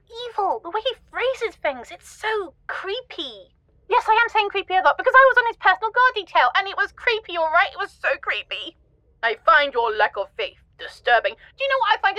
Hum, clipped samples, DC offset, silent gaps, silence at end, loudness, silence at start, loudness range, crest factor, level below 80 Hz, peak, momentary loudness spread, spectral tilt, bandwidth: none; under 0.1%; under 0.1%; none; 0 s; -21 LUFS; 0.1 s; 9 LU; 20 dB; -58 dBFS; 0 dBFS; 14 LU; -2 dB/octave; 12.5 kHz